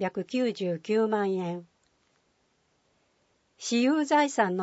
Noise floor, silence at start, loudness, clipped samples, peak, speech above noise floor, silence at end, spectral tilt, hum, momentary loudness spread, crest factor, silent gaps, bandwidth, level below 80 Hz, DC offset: -71 dBFS; 0 s; -27 LUFS; under 0.1%; -10 dBFS; 44 dB; 0 s; -5 dB/octave; none; 10 LU; 18 dB; none; 8 kHz; -80 dBFS; under 0.1%